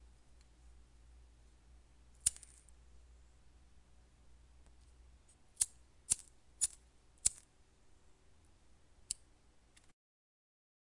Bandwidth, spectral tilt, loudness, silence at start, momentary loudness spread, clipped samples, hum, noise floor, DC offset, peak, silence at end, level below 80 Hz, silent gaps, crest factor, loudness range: 11.5 kHz; 0.5 dB/octave; -38 LUFS; 0.7 s; 23 LU; under 0.1%; none; -67 dBFS; under 0.1%; -12 dBFS; 1.75 s; -64 dBFS; none; 36 dB; 6 LU